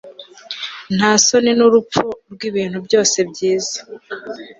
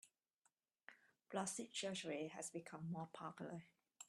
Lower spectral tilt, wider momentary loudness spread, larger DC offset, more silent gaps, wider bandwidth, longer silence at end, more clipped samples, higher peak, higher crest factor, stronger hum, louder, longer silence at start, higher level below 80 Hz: about the same, -3 dB/octave vs -3.5 dB/octave; about the same, 18 LU vs 19 LU; neither; second, none vs 0.34-0.42 s; second, 8 kHz vs 13 kHz; about the same, 0.1 s vs 0.05 s; neither; first, 0 dBFS vs -30 dBFS; second, 16 dB vs 22 dB; neither; first, -16 LUFS vs -49 LUFS; about the same, 0.05 s vs 0.05 s; first, -58 dBFS vs under -90 dBFS